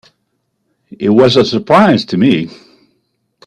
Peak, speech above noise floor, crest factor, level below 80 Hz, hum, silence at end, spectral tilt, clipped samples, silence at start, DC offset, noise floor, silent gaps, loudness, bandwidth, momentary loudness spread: 0 dBFS; 56 dB; 14 dB; -52 dBFS; none; 1 s; -6.5 dB/octave; under 0.1%; 1 s; under 0.1%; -66 dBFS; none; -11 LUFS; 9.8 kHz; 9 LU